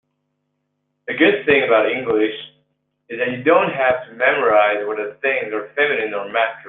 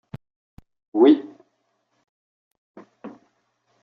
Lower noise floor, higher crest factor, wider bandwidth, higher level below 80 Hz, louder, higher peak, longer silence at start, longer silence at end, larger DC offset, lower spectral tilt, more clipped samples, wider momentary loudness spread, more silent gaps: about the same, -72 dBFS vs -71 dBFS; about the same, 18 dB vs 20 dB; second, 4.1 kHz vs 4.9 kHz; about the same, -62 dBFS vs -64 dBFS; about the same, -18 LUFS vs -18 LUFS; about the same, -2 dBFS vs -4 dBFS; first, 1.1 s vs 0.95 s; second, 0 s vs 0.75 s; neither; first, -8 dB/octave vs -5.5 dB/octave; neither; second, 10 LU vs 27 LU; second, none vs 2.09-2.51 s, 2.58-2.74 s